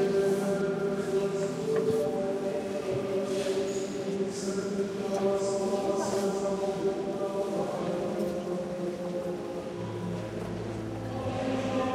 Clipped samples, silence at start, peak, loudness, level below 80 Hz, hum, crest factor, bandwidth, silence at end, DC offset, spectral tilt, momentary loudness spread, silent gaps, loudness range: under 0.1%; 0 s; -16 dBFS; -31 LUFS; -58 dBFS; none; 14 dB; 15 kHz; 0 s; under 0.1%; -6 dB/octave; 7 LU; none; 4 LU